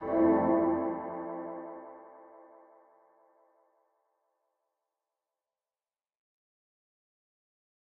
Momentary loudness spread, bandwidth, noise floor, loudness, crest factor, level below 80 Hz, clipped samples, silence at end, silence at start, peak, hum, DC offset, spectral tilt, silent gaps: 24 LU; 3 kHz; under -90 dBFS; -30 LUFS; 20 dB; -68 dBFS; under 0.1%; 5.6 s; 0 s; -16 dBFS; none; under 0.1%; -9 dB/octave; none